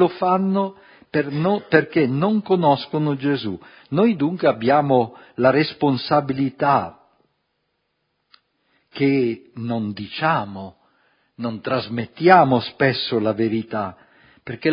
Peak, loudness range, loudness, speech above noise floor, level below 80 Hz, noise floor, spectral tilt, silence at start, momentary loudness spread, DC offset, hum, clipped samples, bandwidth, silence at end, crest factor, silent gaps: 0 dBFS; 5 LU; -20 LUFS; 53 dB; -60 dBFS; -72 dBFS; -10.5 dB/octave; 0 s; 13 LU; under 0.1%; none; under 0.1%; 5.4 kHz; 0 s; 20 dB; none